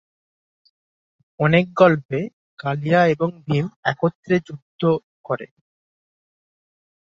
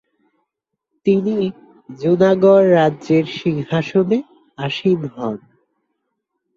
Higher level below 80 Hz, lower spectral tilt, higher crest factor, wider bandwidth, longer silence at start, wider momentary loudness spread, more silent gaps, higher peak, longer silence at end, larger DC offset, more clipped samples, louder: about the same, -60 dBFS vs -60 dBFS; about the same, -8 dB/octave vs -8 dB/octave; about the same, 20 dB vs 16 dB; about the same, 7.4 kHz vs 7.4 kHz; first, 1.4 s vs 1.05 s; about the same, 13 LU vs 14 LU; first, 2.05-2.09 s, 2.33-2.57 s, 3.76-3.83 s, 4.15-4.23 s, 4.62-4.79 s, 5.04-5.24 s vs none; about the same, -2 dBFS vs -2 dBFS; first, 1.65 s vs 1.2 s; neither; neither; second, -20 LUFS vs -17 LUFS